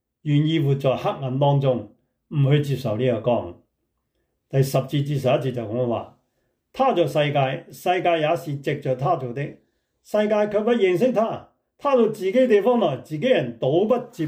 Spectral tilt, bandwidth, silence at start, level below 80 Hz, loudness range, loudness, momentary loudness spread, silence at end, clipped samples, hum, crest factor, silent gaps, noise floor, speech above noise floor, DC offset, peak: -7.5 dB/octave; 16 kHz; 0.25 s; -64 dBFS; 4 LU; -22 LUFS; 8 LU; 0 s; under 0.1%; none; 16 dB; none; -74 dBFS; 53 dB; under 0.1%; -6 dBFS